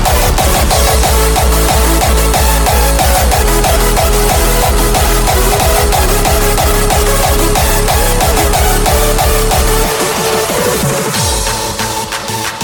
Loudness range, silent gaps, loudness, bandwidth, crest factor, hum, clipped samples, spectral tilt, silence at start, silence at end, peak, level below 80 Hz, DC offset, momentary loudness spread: 2 LU; none; -11 LUFS; 19.5 kHz; 10 dB; none; under 0.1%; -3.5 dB/octave; 0 s; 0 s; 0 dBFS; -14 dBFS; under 0.1%; 3 LU